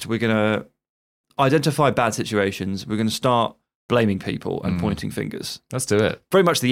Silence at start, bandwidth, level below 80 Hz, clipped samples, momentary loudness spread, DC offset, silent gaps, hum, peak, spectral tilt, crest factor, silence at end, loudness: 0 s; 16.5 kHz; -52 dBFS; under 0.1%; 10 LU; under 0.1%; 0.89-1.24 s, 3.75-3.89 s; none; -4 dBFS; -5 dB/octave; 18 dB; 0 s; -22 LUFS